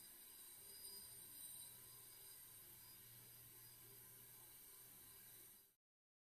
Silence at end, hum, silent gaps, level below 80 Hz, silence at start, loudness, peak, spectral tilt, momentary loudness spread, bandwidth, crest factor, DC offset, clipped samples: 0.6 s; none; none; -86 dBFS; 0 s; -58 LUFS; -44 dBFS; -1 dB/octave; 6 LU; 15.5 kHz; 18 dB; under 0.1%; under 0.1%